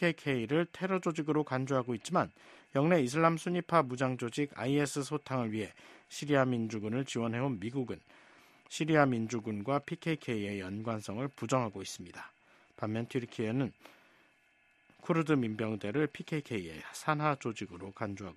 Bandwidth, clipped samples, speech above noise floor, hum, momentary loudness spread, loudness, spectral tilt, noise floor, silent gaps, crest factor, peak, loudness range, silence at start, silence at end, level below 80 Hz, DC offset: 13 kHz; under 0.1%; 36 dB; none; 12 LU; -34 LUFS; -6 dB/octave; -69 dBFS; none; 24 dB; -10 dBFS; 6 LU; 0 s; 0.05 s; -72 dBFS; under 0.1%